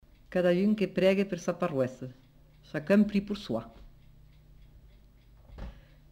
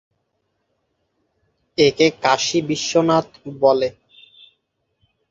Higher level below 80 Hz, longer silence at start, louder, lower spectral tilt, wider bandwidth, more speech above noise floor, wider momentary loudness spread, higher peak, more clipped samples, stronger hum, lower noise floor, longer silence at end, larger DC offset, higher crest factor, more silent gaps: first, -54 dBFS vs -60 dBFS; second, 0.3 s vs 1.8 s; second, -29 LUFS vs -18 LUFS; first, -7 dB/octave vs -4 dB/octave; first, 15 kHz vs 7.8 kHz; second, 29 dB vs 54 dB; first, 22 LU vs 9 LU; second, -12 dBFS vs -2 dBFS; neither; neither; second, -57 dBFS vs -72 dBFS; second, 0.4 s vs 1.4 s; neither; about the same, 18 dB vs 20 dB; neither